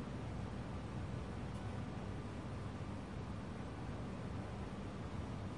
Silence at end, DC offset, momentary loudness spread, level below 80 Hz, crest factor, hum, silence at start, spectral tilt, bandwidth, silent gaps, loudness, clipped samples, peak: 0 s; 0.1%; 1 LU; -54 dBFS; 14 dB; none; 0 s; -7 dB/octave; 11.5 kHz; none; -46 LUFS; under 0.1%; -32 dBFS